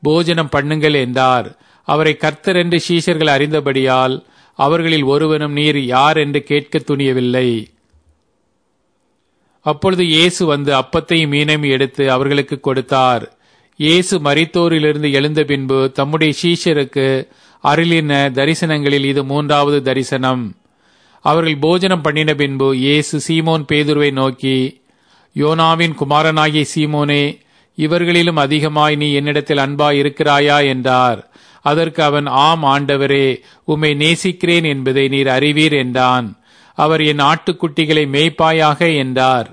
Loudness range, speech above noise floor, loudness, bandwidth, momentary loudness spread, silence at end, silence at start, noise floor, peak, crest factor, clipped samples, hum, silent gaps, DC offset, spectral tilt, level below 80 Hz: 2 LU; 50 dB; -14 LUFS; 10.5 kHz; 6 LU; 0.05 s; 0 s; -64 dBFS; 0 dBFS; 14 dB; under 0.1%; none; none; under 0.1%; -5.5 dB/octave; -52 dBFS